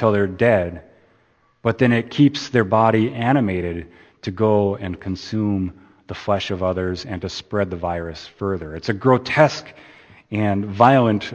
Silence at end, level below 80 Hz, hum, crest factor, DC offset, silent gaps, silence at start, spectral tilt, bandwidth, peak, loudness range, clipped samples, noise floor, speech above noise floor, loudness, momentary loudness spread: 0 s; -50 dBFS; none; 20 dB; under 0.1%; none; 0 s; -7 dB/octave; 8.6 kHz; 0 dBFS; 6 LU; under 0.1%; -60 dBFS; 40 dB; -20 LUFS; 13 LU